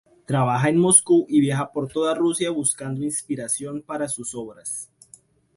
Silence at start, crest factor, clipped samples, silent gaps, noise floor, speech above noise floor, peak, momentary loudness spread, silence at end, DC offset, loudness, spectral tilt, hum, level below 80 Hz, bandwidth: 0.3 s; 22 dB; under 0.1%; none; -53 dBFS; 31 dB; -2 dBFS; 16 LU; 0.75 s; under 0.1%; -21 LUFS; -4.5 dB/octave; none; -62 dBFS; 12 kHz